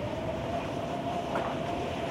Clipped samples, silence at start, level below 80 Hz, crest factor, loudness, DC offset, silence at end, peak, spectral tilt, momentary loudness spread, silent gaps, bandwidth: under 0.1%; 0 s; -52 dBFS; 14 dB; -33 LUFS; under 0.1%; 0 s; -18 dBFS; -6 dB/octave; 2 LU; none; 16 kHz